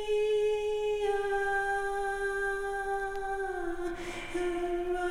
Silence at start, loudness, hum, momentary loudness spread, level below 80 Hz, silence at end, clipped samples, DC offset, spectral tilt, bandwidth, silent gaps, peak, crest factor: 0 s; -32 LUFS; none; 7 LU; -48 dBFS; 0 s; under 0.1%; under 0.1%; -4 dB/octave; 15 kHz; none; -20 dBFS; 12 dB